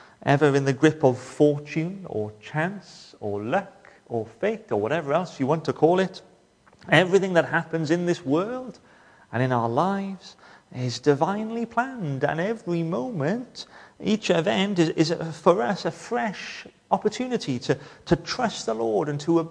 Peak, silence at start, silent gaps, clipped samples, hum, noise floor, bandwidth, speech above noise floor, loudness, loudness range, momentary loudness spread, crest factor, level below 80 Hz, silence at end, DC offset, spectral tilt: -2 dBFS; 0.2 s; none; under 0.1%; none; -57 dBFS; 10.5 kHz; 33 dB; -25 LUFS; 4 LU; 12 LU; 22 dB; -60 dBFS; 0 s; under 0.1%; -6 dB/octave